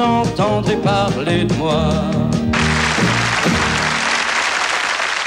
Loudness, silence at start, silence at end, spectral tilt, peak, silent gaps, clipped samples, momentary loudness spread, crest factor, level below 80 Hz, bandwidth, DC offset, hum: -16 LUFS; 0 s; 0 s; -4.5 dB/octave; -6 dBFS; none; under 0.1%; 2 LU; 10 dB; -34 dBFS; 15.5 kHz; under 0.1%; none